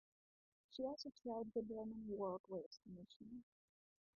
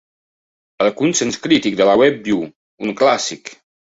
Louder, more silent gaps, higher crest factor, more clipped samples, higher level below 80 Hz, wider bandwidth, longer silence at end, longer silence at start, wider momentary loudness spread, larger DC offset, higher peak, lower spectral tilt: second, -50 LUFS vs -16 LUFS; second, 2.40-2.44 s, 2.66-2.71 s, 3.16-3.20 s vs 2.56-2.78 s; about the same, 18 dB vs 16 dB; neither; second, -80 dBFS vs -56 dBFS; second, 6.8 kHz vs 8 kHz; first, 0.75 s vs 0.45 s; about the same, 0.7 s vs 0.8 s; about the same, 13 LU vs 14 LU; neither; second, -34 dBFS vs -2 dBFS; first, -7 dB/octave vs -3.5 dB/octave